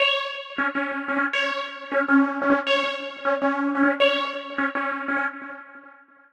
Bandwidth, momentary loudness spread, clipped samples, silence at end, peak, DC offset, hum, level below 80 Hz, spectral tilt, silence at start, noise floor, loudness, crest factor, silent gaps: 8.8 kHz; 9 LU; under 0.1%; 0.4 s; -6 dBFS; under 0.1%; none; -70 dBFS; -3.5 dB/octave; 0 s; -50 dBFS; -23 LUFS; 18 dB; none